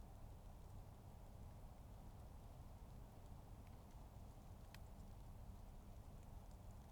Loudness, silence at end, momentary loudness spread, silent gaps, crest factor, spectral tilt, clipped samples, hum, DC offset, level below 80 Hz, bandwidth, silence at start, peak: -61 LUFS; 0 s; 1 LU; none; 16 dB; -6.5 dB/octave; under 0.1%; none; under 0.1%; -60 dBFS; 19.5 kHz; 0 s; -42 dBFS